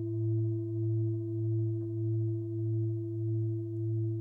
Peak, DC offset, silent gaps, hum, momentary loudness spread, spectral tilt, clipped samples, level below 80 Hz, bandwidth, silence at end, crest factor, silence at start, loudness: -24 dBFS; under 0.1%; none; none; 3 LU; -14 dB/octave; under 0.1%; -68 dBFS; 1.1 kHz; 0 s; 8 dB; 0 s; -33 LUFS